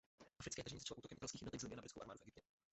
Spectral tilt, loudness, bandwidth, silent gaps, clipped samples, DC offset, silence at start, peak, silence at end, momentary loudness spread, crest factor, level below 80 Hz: -3.5 dB/octave; -52 LUFS; 8.2 kHz; none; under 0.1%; under 0.1%; 0.2 s; -34 dBFS; 0.3 s; 8 LU; 20 dB; -72 dBFS